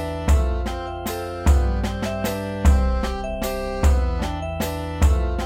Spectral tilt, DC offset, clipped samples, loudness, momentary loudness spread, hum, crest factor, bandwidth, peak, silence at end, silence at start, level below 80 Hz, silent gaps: -6 dB/octave; under 0.1%; under 0.1%; -23 LUFS; 7 LU; none; 16 dB; 16.5 kHz; -4 dBFS; 0 s; 0 s; -22 dBFS; none